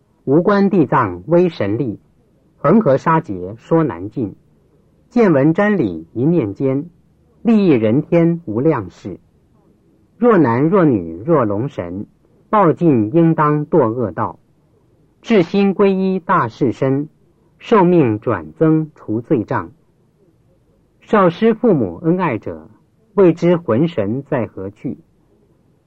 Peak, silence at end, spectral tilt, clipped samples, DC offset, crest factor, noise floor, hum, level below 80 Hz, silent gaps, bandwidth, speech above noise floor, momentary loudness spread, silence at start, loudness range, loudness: -2 dBFS; 0.9 s; -9.5 dB/octave; under 0.1%; under 0.1%; 14 dB; -56 dBFS; none; -54 dBFS; none; 7.2 kHz; 41 dB; 14 LU; 0.25 s; 3 LU; -16 LUFS